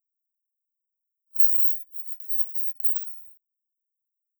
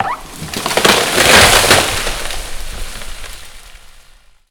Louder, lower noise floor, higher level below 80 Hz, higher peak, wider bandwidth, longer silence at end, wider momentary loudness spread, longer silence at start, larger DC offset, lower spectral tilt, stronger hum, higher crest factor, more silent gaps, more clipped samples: second, -21 LUFS vs -10 LUFS; first, -84 dBFS vs -45 dBFS; second, under -90 dBFS vs -28 dBFS; about the same, -2 dBFS vs 0 dBFS; about the same, over 20 kHz vs over 20 kHz; first, 1.1 s vs 0.5 s; second, 17 LU vs 22 LU; first, 1.35 s vs 0 s; neither; second, 0 dB/octave vs -1.5 dB/octave; neither; first, 26 dB vs 14 dB; neither; neither